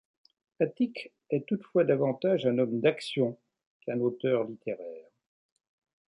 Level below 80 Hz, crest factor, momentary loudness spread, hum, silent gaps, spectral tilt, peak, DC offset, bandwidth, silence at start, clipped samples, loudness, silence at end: -78 dBFS; 20 dB; 12 LU; none; 3.67-3.80 s; -7.5 dB/octave; -12 dBFS; under 0.1%; 11 kHz; 0.6 s; under 0.1%; -29 LUFS; 1.05 s